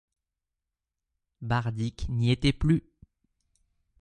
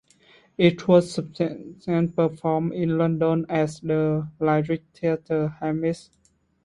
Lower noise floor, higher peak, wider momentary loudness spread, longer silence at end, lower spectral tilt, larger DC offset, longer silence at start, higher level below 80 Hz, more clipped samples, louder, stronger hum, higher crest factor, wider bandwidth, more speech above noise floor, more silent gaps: first, -87 dBFS vs -57 dBFS; second, -8 dBFS vs -4 dBFS; about the same, 8 LU vs 9 LU; first, 1.2 s vs 0.65 s; about the same, -7 dB/octave vs -7.5 dB/octave; neither; first, 1.4 s vs 0.6 s; first, -44 dBFS vs -58 dBFS; neither; second, -28 LUFS vs -24 LUFS; neither; about the same, 22 dB vs 20 dB; second, 9.8 kHz vs 11 kHz; first, 61 dB vs 34 dB; neither